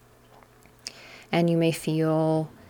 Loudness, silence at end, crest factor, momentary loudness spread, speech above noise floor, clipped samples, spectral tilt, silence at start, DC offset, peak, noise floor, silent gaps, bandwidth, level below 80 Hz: -25 LUFS; 0.2 s; 16 dB; 18 LU; 31 dB; under 0.1%; -6.5 dB/octave; 0.85 s; under 0.1%; -10 dBFS; -54 dBFS; none; 19 kHz; -62 dBFS